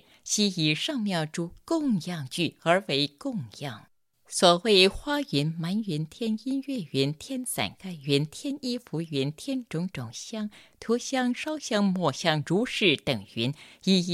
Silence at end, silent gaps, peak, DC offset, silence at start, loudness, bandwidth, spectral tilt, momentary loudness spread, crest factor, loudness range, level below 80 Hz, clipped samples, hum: 0 s; none; -4 dBFS; under 0.1%; 0.25 s; -27 LUFS; 15 kHz; -4.5 dB/octave; 12 LU; 22 dB; 6 LU; -58 dBFS; under 0.1%; none